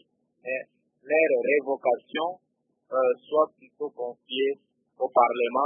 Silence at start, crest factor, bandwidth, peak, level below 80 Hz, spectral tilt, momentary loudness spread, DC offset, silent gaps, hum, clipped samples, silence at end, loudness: 0.45 s; 22 dB; 3.7 kHz; -6 dBFS; -86 dBFS; -7.5 dB/octave; 14 LU; under 0.1%; none; none; under 0.1%; 0 s; -26 LUFS